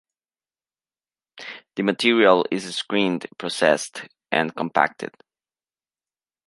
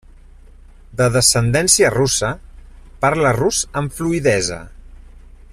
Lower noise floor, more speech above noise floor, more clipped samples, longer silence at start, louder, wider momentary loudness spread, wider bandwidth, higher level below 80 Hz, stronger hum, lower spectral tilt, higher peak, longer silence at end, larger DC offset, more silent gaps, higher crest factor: first, under -90 dBFS vs -42 dBFS; first, over 69 dB vs 26 dB; neither; first, 1.35 s vs 0.9 s; second, -21 LUFS vs -16 LUFS; first, 19 LU vs 11 LU; second, 11.5 kHz vs 15 kHz; second, -72 dBFS vs -38 dBFS; neither; about the same, -4 dB/octave vs -3.5 dB/octave; about the same, 0 dBFS vs 0 dBFS; first, 1.4 s vs 0.35 s; neither; neither; first, 24 dB vs 18 dB